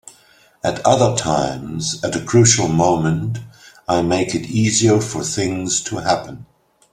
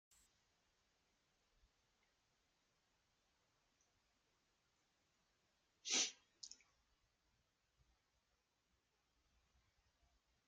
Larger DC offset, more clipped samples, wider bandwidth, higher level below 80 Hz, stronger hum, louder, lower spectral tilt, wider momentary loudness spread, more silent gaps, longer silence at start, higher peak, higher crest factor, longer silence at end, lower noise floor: neither; neither; first, 13.5 kHz vs 7.6 kHz; first, -48 dBFS vs -88 dBFS; neither; first, -17 LUFS vs -40 LUFS; first, -4.5 dB/octave vs 2 dB/octave; second, 10 LU vs 19 LU; neither; second, 0.65 s vs 5.85 s; first, 0 dBFS vs -26 dBFS; second, 18 dB vs 30 dB; second, 0.5 s vs 3.95 s; second, -52 dBFS vs -86 dBFS